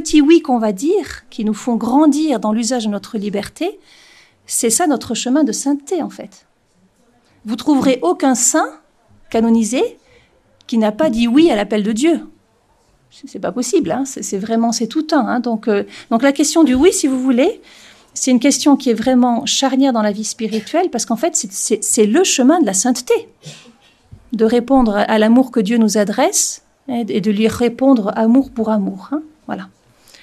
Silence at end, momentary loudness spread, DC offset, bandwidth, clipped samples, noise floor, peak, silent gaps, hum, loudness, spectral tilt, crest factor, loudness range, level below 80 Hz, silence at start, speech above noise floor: 0.55 s; 11 LU; under 0.1%; 14 kHz; under 0.1%; -57 dBFS; 0 dBFS; none; none; -15 LUFS; -3.5 dB/octave; 16 dB; 4 LU; -46 dBFS; 0 s; 42 dB